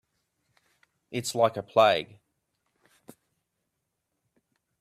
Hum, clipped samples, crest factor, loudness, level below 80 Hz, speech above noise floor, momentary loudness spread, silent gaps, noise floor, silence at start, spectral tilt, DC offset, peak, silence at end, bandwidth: none; under 0.1%; 24 dB; -25 LUFS; -74 dBFS; 57 dB; 14 LU; none; -81 dBFS; 1.1 s; -4 dB/octave; under 0.1%; -8 dBFS; 2.75 s; 15 kHz